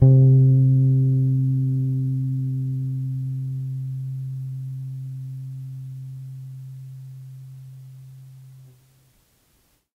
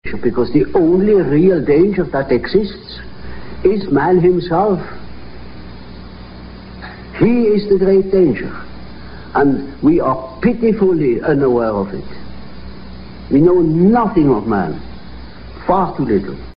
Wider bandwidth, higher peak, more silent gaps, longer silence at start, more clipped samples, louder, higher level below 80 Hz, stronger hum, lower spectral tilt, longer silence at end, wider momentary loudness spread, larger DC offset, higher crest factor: second, 0.9 kHz vs 5.4 kHz; second, -4 dBFS vs 0 dBFS; neither; about the same, 0 s vs 0.05 s; neither; second, -22 LUFS vs -14 LUFS; second, -54 dBFS vs -36 dBFS; neither; first, -12 dB/octave vs -7 dB/octave; first, 1.35 s vs 0.1 s; about the same, 24 LU vs 23 LU; neither; about the same, 20 dB vs 16 dB